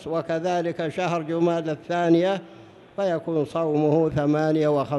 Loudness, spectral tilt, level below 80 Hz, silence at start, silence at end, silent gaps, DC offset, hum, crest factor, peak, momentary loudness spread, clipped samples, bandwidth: -24 LUFS; -7.5 dB/octave; -58 dBFS; 0 s; 0 s; none; under 0.1%; none; 14 dB; -8 dBFS; 7 LU; under 0.1%; 10.5 kHz